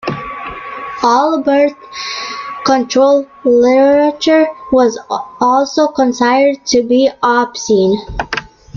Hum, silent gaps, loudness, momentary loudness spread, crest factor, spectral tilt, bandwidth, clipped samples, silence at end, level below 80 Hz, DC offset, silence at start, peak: none; none; -13 LUFS; 12 LU; 12 dB; -4 dB/octave; 7.4 kHz; under 0.1%; 0.35 s; -42 dBFS; under 0.1%; 0.05 s; 0 dBFS